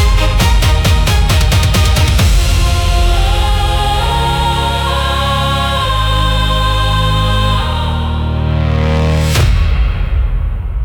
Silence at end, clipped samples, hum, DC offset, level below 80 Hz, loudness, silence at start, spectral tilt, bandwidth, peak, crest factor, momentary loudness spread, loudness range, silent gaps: 0 s; under 0.1%; none; under 0.1%; -14 dBFS; -13 LUFS; 0 s; -4.5 dB/octave; 17.5 kHz; -2 dBFS; 10 dB; 5 LU; 2 LU; none